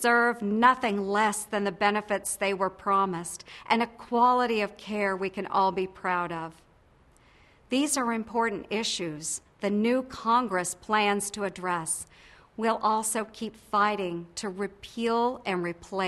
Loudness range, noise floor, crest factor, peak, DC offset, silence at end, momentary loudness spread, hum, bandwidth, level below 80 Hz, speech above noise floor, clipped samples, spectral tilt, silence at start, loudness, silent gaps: 4 LU; -60 dBFS; 22 dB; -6 dBFS; under 0.1%; 0 s; 11 LU; none; 12.5 kHz; -62 dBFS; 32 dB; under 0.1%; -3.5 dB/octave; 0 s; -28 LUFS; none